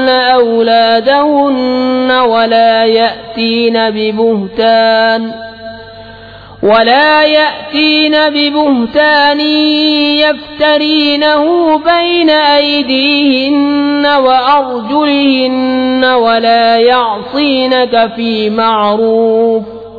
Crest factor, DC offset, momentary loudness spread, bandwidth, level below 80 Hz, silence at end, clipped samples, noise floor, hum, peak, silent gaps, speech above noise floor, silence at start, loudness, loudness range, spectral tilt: 10 dB; under 0.1%; 5 LU; 5 kHz; -48 dBFS; 0 s; under 0.1%; -32 dBFS; none; 0 dBFS; none; 23 dB; 0 s; -9 LUFS; 2 LU; -6 dB/octave